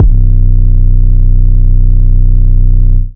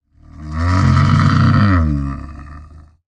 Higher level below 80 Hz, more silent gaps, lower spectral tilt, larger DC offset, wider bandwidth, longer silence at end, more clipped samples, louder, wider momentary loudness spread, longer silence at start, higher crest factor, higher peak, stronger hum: first, -6 dBFS vs -30 dBFS; neither; first, -13.5 dB/octave vs -7.5 dB/octave; neither; second, 0.7 kHz vs 8.6 kHz; second, 0.05 s vs 0.4 s; first, 10% vs under 0.1%; first, -11 LUFS vs -14 LUFS; second, 0 LU vs 20 LU; second, 0 s vs 0.4 s; second, 4 dB vs 14 dB; about the same, 0 dBFS vs -2 dBFS; neither